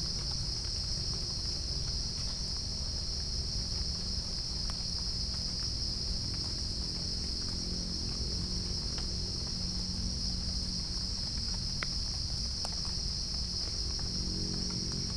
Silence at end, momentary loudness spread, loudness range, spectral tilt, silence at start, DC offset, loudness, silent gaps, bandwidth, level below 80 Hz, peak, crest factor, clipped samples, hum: 0 s; 1 LU; 1 LU; -3 dB/octave; 0 s; under 0.1%; -34 LUFS; none; 10.5 kHz; -40 dBFS; -16 dBFS; 18 dB; under 0.1%; none